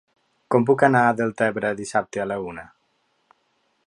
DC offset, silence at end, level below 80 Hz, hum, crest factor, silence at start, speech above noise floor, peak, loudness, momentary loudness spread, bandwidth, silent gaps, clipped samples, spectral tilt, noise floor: under 0.1%; 1.2 s; -62 dBFS; none; 22 dB; 0.5 s; 48 dB; -2 dBFS; -21 LUFS; 12 LU; 11 kHz; none; under 0.1%; -6.5 dB/octave; -69 dBFS